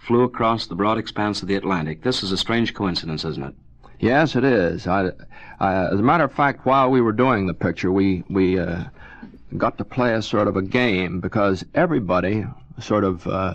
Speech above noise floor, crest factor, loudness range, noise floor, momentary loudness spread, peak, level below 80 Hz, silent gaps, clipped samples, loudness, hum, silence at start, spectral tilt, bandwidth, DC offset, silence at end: 20 dB; 18 dB; 3 LU; -41 dBFS; 8 LU; -2 dBFS; -46 dBFS; none; under 0.1%; -21 LUFS; none; 0.05 s; -6.5 dB/octave; 9.6 kHz; under 0.1%; 0 s